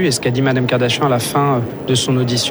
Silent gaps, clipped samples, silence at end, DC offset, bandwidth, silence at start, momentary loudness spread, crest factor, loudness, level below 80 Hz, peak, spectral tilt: none; under 0.1%; 0 s; under 0.1%; over 20 kHz; 0 s; 2 LU; 12 dB; -16 LUFS; -48 dBFS; -2 dBFS; -4.5 dB/octave